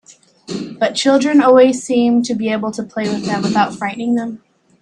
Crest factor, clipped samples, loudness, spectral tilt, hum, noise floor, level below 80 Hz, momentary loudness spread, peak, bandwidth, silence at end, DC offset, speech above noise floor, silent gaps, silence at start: 16 dB; under 0.1%; -15 LUFS; -5 dB/octave; none; -35 dBFS; -60 dBFS; 12 LU; 0 dBFS; 10.5 kHz; 0.45 s; under 0.1%; 21 dB; none; 0.1 s